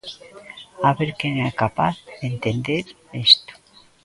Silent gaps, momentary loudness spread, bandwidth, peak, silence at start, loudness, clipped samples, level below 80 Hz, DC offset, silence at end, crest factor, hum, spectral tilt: none; 25 LU; 11.5 kHz; 0 dBFS; 0.05 s; -20 LUFS; under 0.1%; -54 dBFS; under 0.1%; 0.5 s; 22 dB; none; -5.5 dB/octave